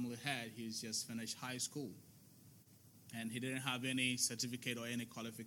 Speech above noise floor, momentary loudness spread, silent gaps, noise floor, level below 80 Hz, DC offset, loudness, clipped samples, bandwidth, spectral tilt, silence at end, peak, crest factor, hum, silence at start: 21 dB; 11 LU; none; -64 dBFS; under -90 dBFS; under 0.1%; -41 LUFS; under 0.1%; 18 kHz; -2.5 dB/octave; 0 s; -24 dBFS; 20 dB; none; 0 s